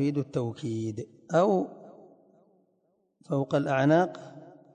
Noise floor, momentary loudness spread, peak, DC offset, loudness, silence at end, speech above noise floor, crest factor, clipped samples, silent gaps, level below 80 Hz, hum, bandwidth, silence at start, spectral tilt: -72 dBFS; 15 LU; -12 dBFS; under 0.1%; -28 LUFS; 0.25 s; 45 dB; 18 dB; under 0.1%; none; -70 dBFS; none; 9.4 kHz; 0 s; -7.5 dB/octave